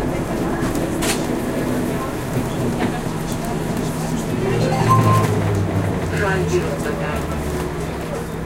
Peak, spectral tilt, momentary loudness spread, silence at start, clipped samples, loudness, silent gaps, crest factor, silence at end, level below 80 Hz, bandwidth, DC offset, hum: -2 dBFS; -6 dB/octave; 8 LU; 0 s; under 0.1%; -21 LUFS; none; 18 dB; 0 s; -34 dBFS; 17 kHz; under 0.1%; none